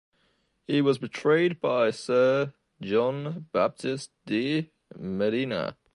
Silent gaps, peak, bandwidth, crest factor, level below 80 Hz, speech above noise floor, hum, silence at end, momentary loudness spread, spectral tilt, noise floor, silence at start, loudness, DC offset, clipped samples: none; -10 dBFS; 11 kHz; 16 dB; -66 dBFS; 44 dB; none; 0.2 s; 12 LU; -6 dB/octave; -70 dBFS; 0.7 s; -27 LUFS; under 0.1%; under 0.1%